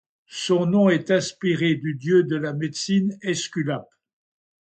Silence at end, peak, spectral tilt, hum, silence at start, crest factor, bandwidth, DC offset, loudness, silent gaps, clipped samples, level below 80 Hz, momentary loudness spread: 0.85 s; -6 dBFS; -5.5 dB/octave; none; 0.3 s; 16 dB; 9 kHz; under 0.1%; -22 LUFS; none; under 0.1%; -66 dBFS; 9 LU